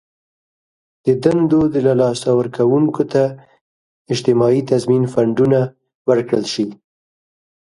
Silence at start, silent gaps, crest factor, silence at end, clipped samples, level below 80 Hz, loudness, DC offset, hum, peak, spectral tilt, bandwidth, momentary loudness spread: 1.05 s; 3.61-4.05 s, 5.95-6.05 s; 16 dB; 0.9 s; under 0.1%; -54 dBFS; -16 LUFS; under 0.1%; none; 0 dBFS; -7 dB/octave; 11.5 kHz; 8 LU